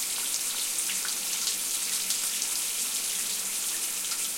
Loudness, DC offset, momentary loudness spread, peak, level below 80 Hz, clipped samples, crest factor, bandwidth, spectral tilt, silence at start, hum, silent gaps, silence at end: -27 LUFS; under 0.1%; 2 LU; -10 dBFS; -70 dBFS; under 0.1%; 20 dB; 17 kHz; 2.5 dB/octave; 0 s; none; none; 0 s